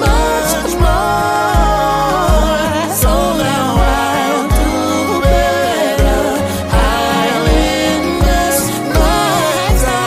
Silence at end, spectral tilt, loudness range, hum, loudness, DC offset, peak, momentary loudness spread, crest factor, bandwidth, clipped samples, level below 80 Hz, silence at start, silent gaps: 0 s; -4.5 dB/octave; 1 LU; none; -13 LUFS; under 0.1%; 0 dBFS; 2 LU; 12 dB; 16 kHz; under 0.1%; -18 dBFS; 0 s; none